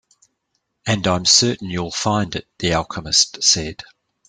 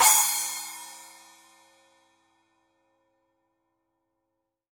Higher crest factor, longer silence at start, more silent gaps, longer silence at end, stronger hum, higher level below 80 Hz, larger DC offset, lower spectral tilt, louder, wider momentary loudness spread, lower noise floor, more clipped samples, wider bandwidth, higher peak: about the same, 20 dB vs 24 dB; first, 0.85 s vs 0 s; neither; second, 0.45 s vs 3.7 s; neither; first, -48 dBFS vs -82 dBFS; neither; first, -2.5 dB/octave vs 3.5 dB/octave; first, -17 LUFS vs -23 LUFS; second, 13 LU vs 27 LU; second, -73 dBFS vs -82 dBFS; neither; second, 12 kHz vs 17.5 kHz; first, 0 dBFS vs -6 dBFS